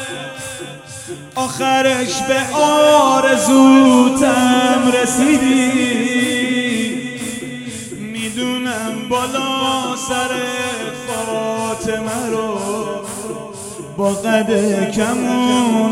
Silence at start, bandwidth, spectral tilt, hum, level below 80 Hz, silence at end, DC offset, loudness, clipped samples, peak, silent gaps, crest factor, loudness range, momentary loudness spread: 0 s; 15.5 kHz; -3.5 dB/octave; none; -52 dBFS; 0 s; under 0.1%; -15 LUFS; under 0.1%; 0 dBFS; none; 16 dB; 9 LU; 16 LU